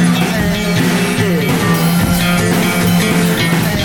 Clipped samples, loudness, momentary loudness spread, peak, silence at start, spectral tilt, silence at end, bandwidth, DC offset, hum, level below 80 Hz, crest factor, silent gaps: under 0.1%; -13 LUFS; 2 LU; -2 dBFS; 0 s; -5 dB/octave; 0 s; 18.5 kHz; under 0.1%; none; -32 dBFS; 12 dB; none